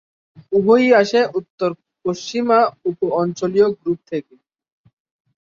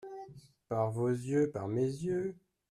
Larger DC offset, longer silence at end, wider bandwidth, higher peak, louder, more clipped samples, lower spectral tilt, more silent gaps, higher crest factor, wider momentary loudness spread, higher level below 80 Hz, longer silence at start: neither; first, 1.4 s vs 0.35 s; second, 7.6 kHz vs 13 kHz; first, -2 dBFS vs -20 dBFS; first, -18 LUFS vs -34 LUFS; neither; second, -5.5 dB/octave vs -8 dB/octave; first, 1.50-1.58 s vs none; about the same, 18 dB vs 16 dB; second, 12 LU vs 15 LU; first, -62 dBFS vs -70 dBFS; first, 0.5 s vs 0 s